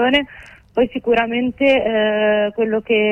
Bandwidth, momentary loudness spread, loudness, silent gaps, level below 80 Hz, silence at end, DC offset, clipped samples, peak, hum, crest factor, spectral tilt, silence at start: 7.8 kHz; 5 LU; -17 LUFS; none; -48 dBFS; 0 s; under 0.1%; under 0.1%; -4 dBFS; none; 14 dB; -6 dB/octave; 0 s